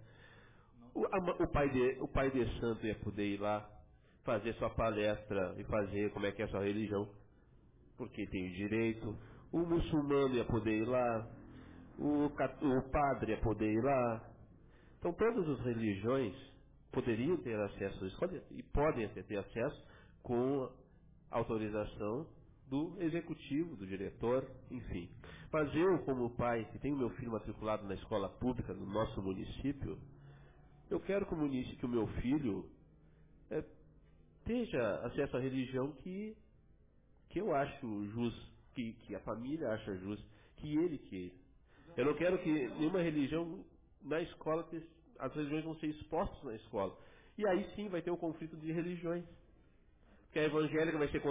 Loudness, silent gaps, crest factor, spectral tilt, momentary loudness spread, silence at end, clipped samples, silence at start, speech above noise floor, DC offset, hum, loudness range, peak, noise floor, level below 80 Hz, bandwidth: -38 LUFS; none; 14 dB; -6 dB/octave; 12 LU; 0 s; under 0.1%; 0 s; 30 dB; under 0.1%; none; 5 LU; -24 dBFS; -67 dBFS; -56 dBFS; 3.8 kHz